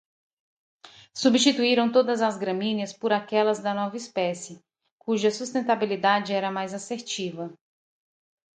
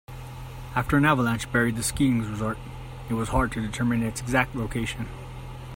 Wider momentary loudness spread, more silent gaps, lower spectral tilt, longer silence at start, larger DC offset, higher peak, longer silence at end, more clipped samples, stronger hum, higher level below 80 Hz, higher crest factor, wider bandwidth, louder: second, 13 LU vs 18 LU; first, 4.92-4.98 s vs none; second, -4 dB/octave vs -5.5 dB/octave; first, 0.85 s vs 0.1 s; neither; about the same, -8 dBFS vs -6 dBFS; first, 1 s vs 0 s; neither; neither; second, -76 dBFS vs -40 dBFS; about the same, 20 dB vs 20 dB; second, 9.4 kHz vs 16.5 kHz; about the same, -25 LUFS vs -26 LUFS